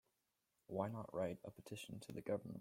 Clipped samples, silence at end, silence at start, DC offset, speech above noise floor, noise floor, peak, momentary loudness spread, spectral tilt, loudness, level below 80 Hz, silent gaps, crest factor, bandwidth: under 0.1%; 0 s; 0.7 s; under 0.1%; 41 dB; -87 dBFS; -26 dBFS; 8 LU; -6.5 dB/octave; -47 LUFS; -78 dBFS; none; 22 dB; 16.5 kHz